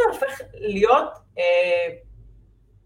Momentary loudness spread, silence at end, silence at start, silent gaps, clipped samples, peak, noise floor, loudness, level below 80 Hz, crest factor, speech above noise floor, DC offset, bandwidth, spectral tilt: 12 LU; 0.75 s; 0 s; none; under 0.1%; -4 dBFS; -53 dBFS; -22 LUFS; -52 dBFS; 18 dB; 32 dB; under 0.1%; 16.5 kHz; -4.5 dB/octave